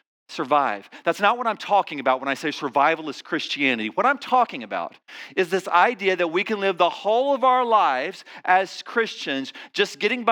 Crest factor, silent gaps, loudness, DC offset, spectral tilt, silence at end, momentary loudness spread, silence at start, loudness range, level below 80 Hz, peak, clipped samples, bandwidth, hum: 18 dB; none; -22 LUFS; under 0.1%; -4 dB/octave; 0 s; 10 LU; 0.3 s; 2 LU; under -90 dBFS; -4 dBFS; under 0.1%; 18 kHz; none